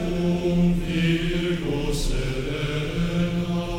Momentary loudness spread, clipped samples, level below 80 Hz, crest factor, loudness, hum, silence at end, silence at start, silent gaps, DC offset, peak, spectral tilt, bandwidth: 5 LU; under 0.1%; -32 dBFS; 14 dB; -24 LUFS; none; 0 s; 0 s; none; under 0.1%; -10 dBFS; -6.5 dB/octave; 15 kHz